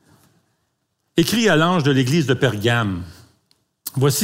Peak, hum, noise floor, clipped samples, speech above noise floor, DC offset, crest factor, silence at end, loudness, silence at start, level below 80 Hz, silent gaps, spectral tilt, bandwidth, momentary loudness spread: -2 dBFS; none; -71 dBFS; under 0.1%; 54 dB; under 0.1%; 18 dB; 0 s; -18 LUFS; 1.15 s; -54 dBFS; none; -5 dB/octave; 16 kHz; 14 LU